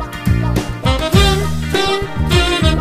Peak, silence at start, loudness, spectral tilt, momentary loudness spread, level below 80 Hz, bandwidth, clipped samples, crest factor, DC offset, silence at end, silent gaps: 0 dBFS; 0 s; -15 LUFS; -5 dB/octave; 6 LU; -22 dBFS; 15.5 kHz; under 0.1%; 14 dB; under 0.1%; 0 s; none